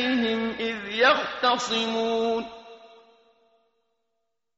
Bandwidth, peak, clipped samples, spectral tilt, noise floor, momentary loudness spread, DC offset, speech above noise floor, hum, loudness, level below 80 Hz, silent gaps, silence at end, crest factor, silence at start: 8 kHz; -8 dBFS; under 0.1%; -0.5 dB/octave; -81 dBFS; 10 LU; under 0.1%; 57 dB; none; -24 LUFS; -64 dBFS; none; 1.7 s; 20 dB; 0 s